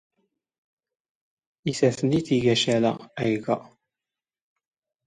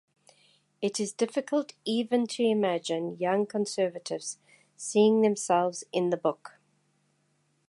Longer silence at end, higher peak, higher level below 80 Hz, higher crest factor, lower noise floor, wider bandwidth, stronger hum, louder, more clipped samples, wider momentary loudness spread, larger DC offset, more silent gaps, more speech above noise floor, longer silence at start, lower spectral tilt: first, 1.45 s vs 1.2 s; first, -8 dBFS vs -12 dBFS; first, -62 dBFS vs -84 dBFS; about the same, 20 dB vs 18 dB; first, under -90 dBFS vs -72 dBFS; about the same, 11 kHz vs 11.5 kHz; neither; first, -24 LUFS vs -28 LUFS; neither; about the same, 9 LU vs 11 LU; neither; neither; first, over 67 dB vs 44 dB; first, 1.65 s vs 0.8 s; about the same, -5.5 dB/octave vs -4.5 dB/octave